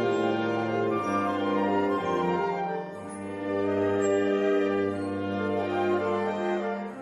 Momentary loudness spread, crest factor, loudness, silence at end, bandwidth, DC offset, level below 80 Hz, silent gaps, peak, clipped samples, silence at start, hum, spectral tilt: 7 LU; 12 dB; -27 LUFS; 0 s; 11.5 kHz; under 0.1%; -70 dBFS; none; -14 dBFS; under 0.1%; 0 s; none; -6.5 dB/octave